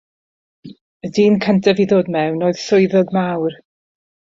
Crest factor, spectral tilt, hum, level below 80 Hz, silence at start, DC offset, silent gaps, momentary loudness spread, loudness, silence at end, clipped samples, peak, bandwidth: 16 dB; -6.5 dB/octave; none; -58 dBFS; 0.65 s; under 0.1%; 0.81-1.00 s; 9 LU; -16 LUFS; 0.8 s; under 0.1%; -2 dBFS; 7.6 kHz